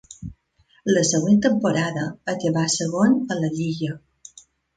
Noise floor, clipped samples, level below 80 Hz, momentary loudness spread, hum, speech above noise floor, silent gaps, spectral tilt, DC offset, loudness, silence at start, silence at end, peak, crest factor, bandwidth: -61 dBFS; under 0.1%; -56 dBFS; 15 LU; none; 40 dB; none; -5 dB/octave; under 0.1%; -21 LUFS; 0.1 s; 0.8 s; -6 dBFS; 16 dB; 9.4 kHz